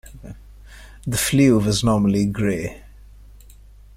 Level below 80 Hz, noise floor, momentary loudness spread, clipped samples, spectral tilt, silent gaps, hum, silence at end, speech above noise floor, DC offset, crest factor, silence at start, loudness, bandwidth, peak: -40 dBFS; -45 dBFS; 23 LU; under 0.1%; -5.5 dB/octave; none; none; 1.1 s; 27 dB; under 0.1%; 18 dB; 0.05 s; -19 LUFS; 16 kHz; -4 dBFS